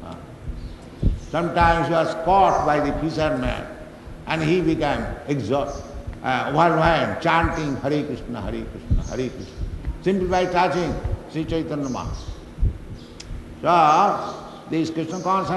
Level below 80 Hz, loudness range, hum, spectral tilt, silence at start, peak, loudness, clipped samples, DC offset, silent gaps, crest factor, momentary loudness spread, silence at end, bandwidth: -34 dBFS; 4 LU; none; -6.5 dB/octave; 0 s; -2 dBFS; -22 LUFS; under 0.1%; under 0.1%; none; 20 dB; 19 LU; 0 s; 12 kHz